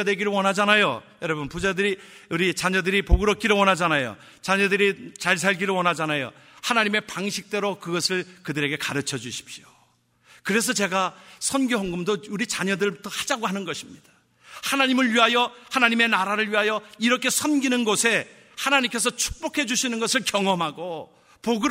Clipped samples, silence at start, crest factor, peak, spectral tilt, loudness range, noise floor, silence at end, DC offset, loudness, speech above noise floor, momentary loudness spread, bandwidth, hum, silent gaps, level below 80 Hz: under 0.1%; 0 s; 22 dB; -2 dBFS; -3 dB/octave; 5 LU; -63 dBFS; 0 s; under 0.1%; -23 LUFS; 39 dB; 12 LU; 16 kHz; none; none; -40 dBFS